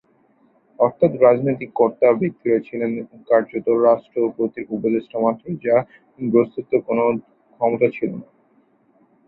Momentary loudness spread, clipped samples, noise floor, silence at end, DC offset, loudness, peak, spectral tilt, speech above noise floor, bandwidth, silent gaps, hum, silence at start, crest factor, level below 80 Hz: 10 LU; under 0.1%; -59 dBFS; 1.05 s; under 0.1%; -20 LUFS; -2 dBFS; -12 dB/octave; 40 dB; 4.1 kHz; none; none; 0.8 s; 18 dB; -62 dBFS